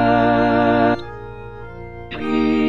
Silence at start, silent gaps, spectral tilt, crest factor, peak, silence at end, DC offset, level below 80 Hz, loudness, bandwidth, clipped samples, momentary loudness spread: 0 s; none; -8 dB/octave; 14 dB; -4 dBFS; 0 s; 1%; -42 dBFS; -17 LUFS; 7.2 kHz; under 0.1%; 20 LU